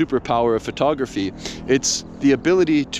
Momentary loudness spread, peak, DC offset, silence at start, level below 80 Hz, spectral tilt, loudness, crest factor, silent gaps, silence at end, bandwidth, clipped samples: 9 LU; -4 dBFS; under 0.1%; 0 s; -46 dBFS; -4 dB/octave; -20 LUFS; 14 dB; none; 0 s; 13 kHz; under 0.1%